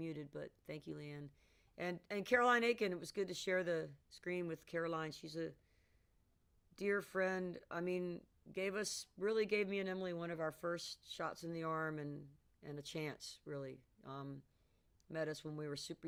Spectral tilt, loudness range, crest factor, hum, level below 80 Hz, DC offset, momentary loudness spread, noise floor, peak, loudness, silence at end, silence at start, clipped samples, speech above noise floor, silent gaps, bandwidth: -4.5 dB/octave; 9 LU; 24 dB; none; -76 dBFS; under 0.1%; 15 LU; -76 dBFS; -20 dBFS; -42 LUFS; 0 s; 0 s; under 0.1%; 34 dB; none; 16.5 kHz